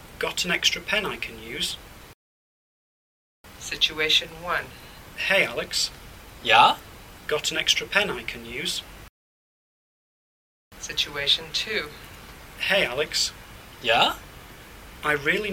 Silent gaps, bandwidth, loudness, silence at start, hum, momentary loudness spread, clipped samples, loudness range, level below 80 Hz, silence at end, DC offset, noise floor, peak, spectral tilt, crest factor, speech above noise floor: 2.14-3.44 s, 9.09-10.71 s; 18 kHz; -23 LUFS; 0 s; none; 23 LU; under 0.1%; 6 LU; -52 dBFS; 0 s; under 0.1%; -44 dBFS; -2 dBFS; -1.5 dB/octave; 24 dB; 20 dB